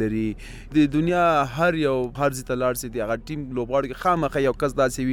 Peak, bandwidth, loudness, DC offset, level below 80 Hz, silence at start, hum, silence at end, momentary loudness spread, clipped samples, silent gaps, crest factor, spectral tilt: -8 dBFS; 17.5 kHz; -23 LUFS; under 0.1%; -42 dBFS; 0 s; none; 0 s; 8 LU; under 0.1%; none; 16 dB; -6 dB/octave